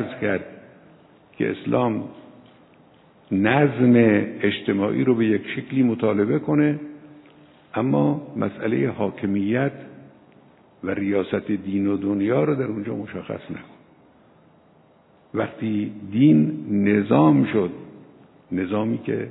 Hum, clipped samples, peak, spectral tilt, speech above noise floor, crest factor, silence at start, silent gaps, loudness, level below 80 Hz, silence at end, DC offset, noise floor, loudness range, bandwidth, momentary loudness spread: none; under 0.1%; -4 dBFS; -12 dB/octave; 35 dB; 20 dB; 0 s; none; -22 LUFS; -66 dBFS; 0 s; under 0.1%; -55 dBFS; 8 LU; 4.1 kHz; 14 LU